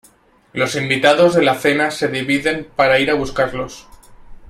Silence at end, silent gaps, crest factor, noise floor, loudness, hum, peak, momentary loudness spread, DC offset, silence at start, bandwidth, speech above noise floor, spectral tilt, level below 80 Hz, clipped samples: 0.05 s; none; 18 dB; -52 dBFS; -16 LUFS; none; 0 dBFS; 9 LU; under 0.1%; 0.55 s; 14 kHz; 36 dB; -4.5 dB/octave; -44 dBFS; under 0.1%